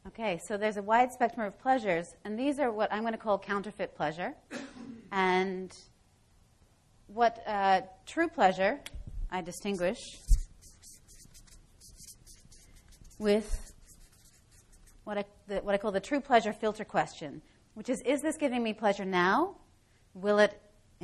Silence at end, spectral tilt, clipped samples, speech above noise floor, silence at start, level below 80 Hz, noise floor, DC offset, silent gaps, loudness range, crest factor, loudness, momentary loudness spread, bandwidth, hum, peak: 0.45 s; -5 dB/octave; under 0.1%; 34 dB; 0.05 s; -44 dBFS; -64 dBFS; under 0.1%; none; 8 LU; 22 dB; -31 LUFS; 17 LU; 13 kHz; none; -12 dBFS